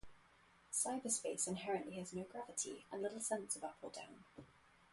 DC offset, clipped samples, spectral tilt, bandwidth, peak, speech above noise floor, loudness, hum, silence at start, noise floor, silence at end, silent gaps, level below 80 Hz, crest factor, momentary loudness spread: under 0.1%; under 0.1%; -3 dB/octave; 12 kHz; -24 dBFS; 25 dB; -43 LUFS; none; 0.05 s; -70 dBFS; 0.05 s; none; -76 dBFS; 22 dB; 15 LU